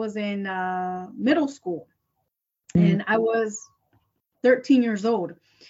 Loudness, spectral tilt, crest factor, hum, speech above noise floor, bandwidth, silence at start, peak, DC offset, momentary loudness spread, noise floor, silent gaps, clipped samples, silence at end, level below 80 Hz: -24 LUFS; -6.5 dB/octave; 18 dB; none; 55 dB; 8 kHz; 0 s; -6 dBFS; under 0.1%; 13 LU; -78 dBFS; none; under 0.1%; 0.35 s; -60 dBFS